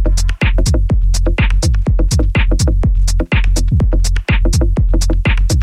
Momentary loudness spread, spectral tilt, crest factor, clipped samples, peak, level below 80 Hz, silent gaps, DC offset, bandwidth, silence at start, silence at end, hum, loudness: 1 LU; -5 dB/octave; 8 dB; under 0.1%; -4 dBFS; -12 dBFS; none; 0.7%; 12.5 kHz; 0 s; 0 s; none; -15 LUFS